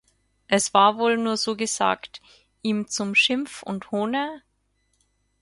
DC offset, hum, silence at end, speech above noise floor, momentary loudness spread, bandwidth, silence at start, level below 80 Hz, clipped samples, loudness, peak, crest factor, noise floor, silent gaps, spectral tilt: under 0.1%; 50 Hz at -65 dBFS; 1.05 s; 47 dB; 13 LU; 11.5 kHz; 0.5 s; -68 dBFS; under 0.1%; -23 LUFS; -2 dBFS; 22 dB; -70 dBFS; none; -3 dB/octave